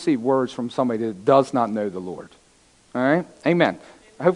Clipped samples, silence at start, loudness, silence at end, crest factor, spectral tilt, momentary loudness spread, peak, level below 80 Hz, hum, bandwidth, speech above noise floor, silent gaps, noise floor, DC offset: under 0.1%; 0 s; -22 LUFS; 0 s; 20 dB; -7 dB/octave; 15 LU; -2 dBFS; -66 dBFS; none; 11 kHz; 35 dB; none; -57 dBFS; under 0.1%